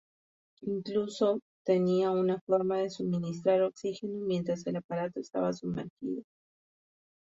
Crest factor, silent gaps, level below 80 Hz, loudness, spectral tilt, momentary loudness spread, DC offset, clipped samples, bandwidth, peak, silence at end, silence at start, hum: 16 dB; 1.42-1.65 s, 2.41-2.47 s, 4.84-4.89 s, 5.90-5.97 s; -72 dBFS; -31 LUFS; -7 dB/octave; 10 LU; under 0.1%; under 0.1%; 7.8 kHz; -14 dBFS; 1.1 s; 0.6 s; none